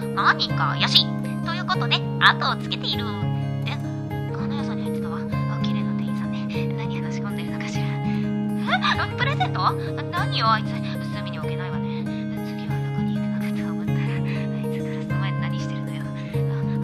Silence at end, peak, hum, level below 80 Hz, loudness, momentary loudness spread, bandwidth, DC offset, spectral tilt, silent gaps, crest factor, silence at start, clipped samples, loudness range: 0 s; 0 dBFS; none; -52 dBFS; -24 LUFS; 9 LU; 14 kHz; under 0.1%; -6 dB/octave; none; 24 dB; 0 s; under 0.1%; 5 LU